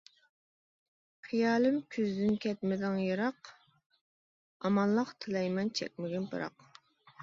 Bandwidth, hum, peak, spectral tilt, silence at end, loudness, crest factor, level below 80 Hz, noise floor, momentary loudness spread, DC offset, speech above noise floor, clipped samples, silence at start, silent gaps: 7.6 kHz; none; -18 dBFS; -6.5 dB/octave; 0 s; -33 LUFS; 16 dB; -74 dBFS; -61 dBFS; 9 LU; under 0.1%; 29 dB; under 0.1%; 1.25 s; 3.86-3.90 s, 4.01-4.60 s